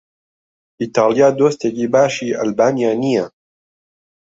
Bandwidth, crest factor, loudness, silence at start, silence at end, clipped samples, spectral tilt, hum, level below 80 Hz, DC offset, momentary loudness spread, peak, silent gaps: 8 kHz; 16 dB; -16 LUFS; 0.8 s; 0.95 s; under 0.1%; -5.5 dB/octave; none; -60 dBFS; under 0.1%; 8 LU; -2 dBFS; none